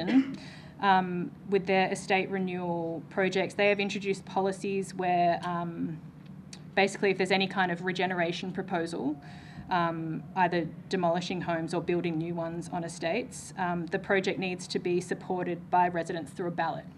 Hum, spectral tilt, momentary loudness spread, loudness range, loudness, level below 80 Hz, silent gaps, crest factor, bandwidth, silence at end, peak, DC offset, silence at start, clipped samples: none; -5.5 dB/octave; 10 LU; 3 LU; -30 LUFS; -64 dBFS; none; 20 dB; 12 kHz; 0 s; -10 dBFS; under 0.1%; 0 s; under 0.1%